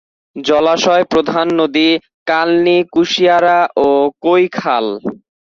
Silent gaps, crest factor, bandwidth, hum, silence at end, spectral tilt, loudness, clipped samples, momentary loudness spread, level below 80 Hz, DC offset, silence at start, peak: 2.14-2.26 s; 12 dB; 7.4 kHz; none; 0.25 s; -4.5 dB/octave; -13 LUFS; under 0.1%; 7 LU; -54 dBFS; under 0.1%; 0.35 s; -2 dBFS